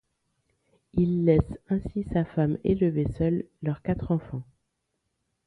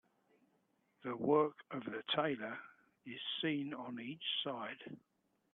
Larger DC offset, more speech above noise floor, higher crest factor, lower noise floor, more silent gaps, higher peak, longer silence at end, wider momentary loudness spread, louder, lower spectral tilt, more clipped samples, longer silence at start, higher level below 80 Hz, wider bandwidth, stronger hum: neither; first, 53 dB vs 39 dB; about the same, 20 dB vs 22 dB; about the same, -79 dBFS vs -78 dBFS; neither; first, -8 dBFS vs -20 dBFS; first, 1.05 s vs 0.55 s; second, 9 LU vs 17 LU; first, -27 LUFS vs -39 LUFS; first, -11 dB/octave vs -7.5 dB/octave; neither; about the same, 0.95 s vs 1.05 s; first, -44 dBFS vs -86 dBFS; about the same, 4.4 kHz vs 4.3 kHz; neither